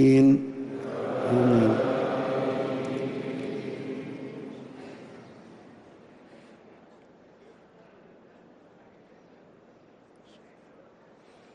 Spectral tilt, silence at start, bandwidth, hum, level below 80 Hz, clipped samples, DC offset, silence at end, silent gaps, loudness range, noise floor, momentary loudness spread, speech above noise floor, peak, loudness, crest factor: -8 dB/octave; 0 s; 10.5 kHz; none; -64 dBFS; under 0.1%; under 0.1%; 5.15 s; none; 24 LU; -56 dBFS; 24 LU; 37 dB; -12 dBFS; -26 LUFS; 18 dB